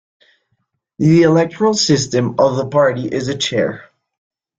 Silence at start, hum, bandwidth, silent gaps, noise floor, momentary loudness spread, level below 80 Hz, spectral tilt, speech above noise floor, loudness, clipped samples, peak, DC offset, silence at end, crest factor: 1 s; none; 9.4 kHz; none; -69 dBFS; 9 LU; -54 dBFS; -5 dB/octave; 54 dB; -15 LUFS; under 0.1%; -2 dBFS; under 0.1%; 0.75 s; 16 dB